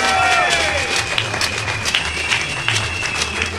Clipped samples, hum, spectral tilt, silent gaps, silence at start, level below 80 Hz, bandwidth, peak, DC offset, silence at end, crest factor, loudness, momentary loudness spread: under 0.1%; none; -2 dB/octave; none; 0 s; -38 dBFS; 16.5 kHz; 0 dBFS; under 0.1%; 0 s; 18 dB; -17 LUFS; 5 LU